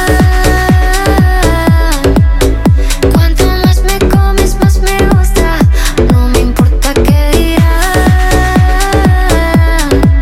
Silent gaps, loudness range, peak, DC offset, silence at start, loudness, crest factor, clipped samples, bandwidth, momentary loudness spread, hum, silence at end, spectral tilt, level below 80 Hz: none; 0 LU; 0 dBFS; 0.2%; 0 s; -9 LUFS; 8 dB; under 0.1%; 16.5 kHz; 2 LU; none; 0 s; -5.5 dB/octave; -10 dBFS